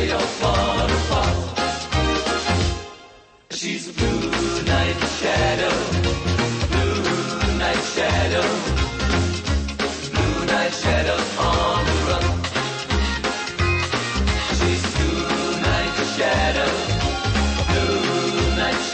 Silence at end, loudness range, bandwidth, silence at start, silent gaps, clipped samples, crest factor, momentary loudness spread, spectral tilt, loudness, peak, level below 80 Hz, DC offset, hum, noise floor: 0 s; 2 LU; 8.8 kHz; 0 s; none; under 0.1%; 14 dB; 4 LU; -4.5 dB/octave; -21 LUFS; -8 dBFS; -28 dBFS; under 0.1%; none; -47 dBFS